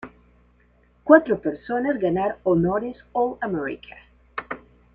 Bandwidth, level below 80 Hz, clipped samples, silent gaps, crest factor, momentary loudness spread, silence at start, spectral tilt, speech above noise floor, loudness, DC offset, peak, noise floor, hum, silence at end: 4.5 kHz; -54 dBFS; under 0.1%; none; 22 dB; 20 LU; 0.05 s; -10 dB/octave; 37 dB; -22 LUFS; under 0.1%; -2 dBFS; -59 dBFS; none; 0.35 s